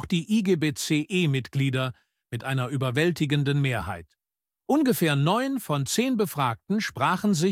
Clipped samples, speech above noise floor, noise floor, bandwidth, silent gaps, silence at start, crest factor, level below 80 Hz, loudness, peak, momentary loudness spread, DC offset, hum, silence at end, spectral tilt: under 0.1%; over 65 dB; under -90 dBFS; 16.5 kHz; none; 0 s; 16 dB; -58 dBFS; -25 LUFS; -8 dBFS; 7 LU; under 0.1%; none; 0 s; -5.5 dB/octave